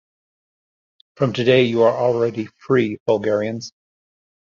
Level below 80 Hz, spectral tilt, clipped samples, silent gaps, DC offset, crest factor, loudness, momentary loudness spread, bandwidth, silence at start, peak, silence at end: -60 dBFS; -6.5 dB/octave; under 0.1%; 3.00-3.06 s; under 0.1%; 18 dB; -19 LUFS; 12 LU; 7.4 kHz; 1.2 s; -2 dBFS; 0.9 s